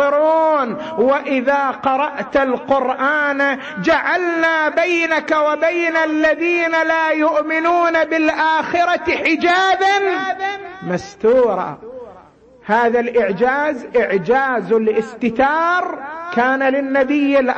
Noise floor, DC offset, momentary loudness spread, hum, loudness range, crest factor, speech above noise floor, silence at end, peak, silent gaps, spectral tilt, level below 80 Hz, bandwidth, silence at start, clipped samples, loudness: -45 dBFS; under 0.1%; 7 LU; none; 3 LU; 14 dB; 29 dB; 0 s; -2 dBFS; none; -5 dB/octave; -54 dBFS; 8.4 kHz; 0 s; under 0.1%; -16 LUFS